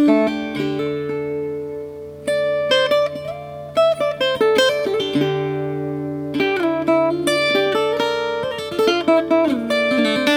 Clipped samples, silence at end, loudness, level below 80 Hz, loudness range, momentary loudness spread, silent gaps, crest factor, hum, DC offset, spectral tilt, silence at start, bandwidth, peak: under 0.1%; 0 s; -19 LUFS; -56 dBFS; 3 LU; 9 LU; none; 18 dB; none; under 0.1%; -5 dB/octave; 0 s; 19 kHz; -2 dBFS